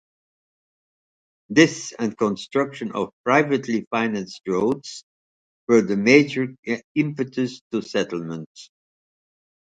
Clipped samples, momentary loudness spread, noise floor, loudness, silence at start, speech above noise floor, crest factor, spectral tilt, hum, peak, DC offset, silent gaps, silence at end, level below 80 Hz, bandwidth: under 0.1%; 13 LU; under -90 dBFS; -22 LUFS; 1.5 s; over 68 dB; 24 dB; -5 dB/octave; none; 0 dBFS; under 0.1%; 3.13-3.24 s, 3.87-3.91 s, 5.03-5.67 s, 6.59-6.63 s, 6.84-6.95 s, 7.61-7.70 s, 8.46-8.55 s; 1.1 s; -64 dBFS; 9.2 kHz